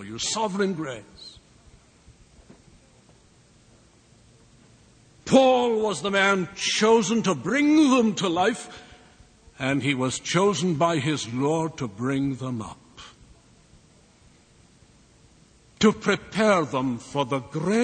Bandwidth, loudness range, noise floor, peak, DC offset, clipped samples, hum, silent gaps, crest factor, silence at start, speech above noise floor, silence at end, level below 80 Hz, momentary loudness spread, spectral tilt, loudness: 9.4 kHz; 12 LU; -56 dBFS; -4 dBFS; under 0.1%; under 0.1%; none; none; 22 dB; 0 s; 33 dB; 0 s; -58 dBFS; 16 LU; -4.5 dB/octave; -23 LUFS